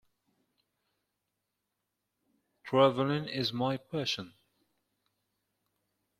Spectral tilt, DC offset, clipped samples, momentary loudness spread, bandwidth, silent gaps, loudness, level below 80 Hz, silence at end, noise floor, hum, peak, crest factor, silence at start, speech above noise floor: -6 dB/octave; under 0.1%; under 0.1%; 9 LU; 14.5 kHz; none; -31 LUFS; -72 dBFS; 1.9 s; -85 dBFS; 50 Hz at -70 dBFS; -10 dBFS; 26 dB; 2.65 s; 55 dB